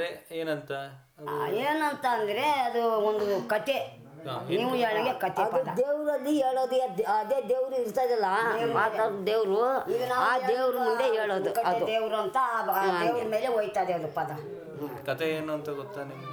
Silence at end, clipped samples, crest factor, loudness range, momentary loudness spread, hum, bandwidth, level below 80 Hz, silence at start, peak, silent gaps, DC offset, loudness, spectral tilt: 0 s; under 0.1%; 16 dB; 2 LU; 11 LU; none; over 20 kHz; -74 dBFS; 0 s; -12 dBFS; none; under 0.1%; -28 LUFS; -5 dB/octave